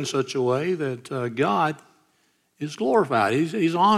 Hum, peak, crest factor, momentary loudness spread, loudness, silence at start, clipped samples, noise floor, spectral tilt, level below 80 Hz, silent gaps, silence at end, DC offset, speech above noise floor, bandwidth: none; -6 dBFS; 16 dB; 9 LU; -23 LUFS; 0 s; under 0.1%; -67 dBFS; -5.5 dB/octave; -74 dBFS; none; 0 s; under 0.1%; 44 dB; 14 kHz